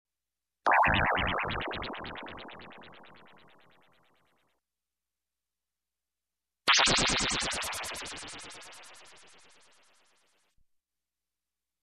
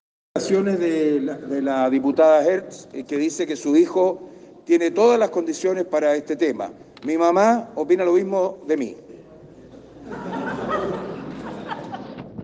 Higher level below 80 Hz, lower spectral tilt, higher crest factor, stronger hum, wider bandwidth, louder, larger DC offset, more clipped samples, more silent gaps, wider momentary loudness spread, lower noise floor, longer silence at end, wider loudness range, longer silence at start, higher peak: first, -52 dBFS vs -60 dBFS; second, -2 dB/octave vs -5.5 dB/octave; about the same, 20 dB vs 16 dB; neither; first, 13.5 kHz vs 9.6 kHz; second, -28 LUFS vs -21 LUFS; neither; neither; neither; first, 24 LU vs 16 LU; first, under -90 dBFS vs -45 dBFS; first, 2.75 s vs 0 s; first, 18 LU vs 9 LU; first, 0.65 s vs 0.35 s; second, -16 dBFS vs -6 dBFS